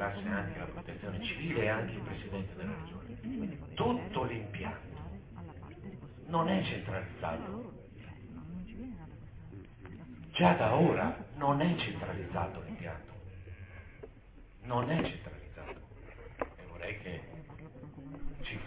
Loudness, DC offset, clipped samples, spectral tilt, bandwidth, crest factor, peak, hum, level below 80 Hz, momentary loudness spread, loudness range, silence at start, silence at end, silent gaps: -35 LUFS; under 0.1%; under 0.1%; -5 dB/octave; 4 kHz; 24 dB; -12 dBFS; none; -52 dBFS; 20 LU; 10 LU; 0 s; 0 s; none